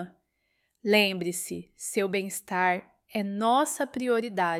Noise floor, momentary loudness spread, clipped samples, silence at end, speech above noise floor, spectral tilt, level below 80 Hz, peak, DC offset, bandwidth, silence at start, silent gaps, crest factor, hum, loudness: -75 dBFS; 13 LU; under 0.1%; 0 s; 48 dB; -3.5 dB/octave; -72 dBFS; -8 dBFS; under 0.1%; 16.5 kHz; 0 s; none; 20 dB; none; -27 LUFS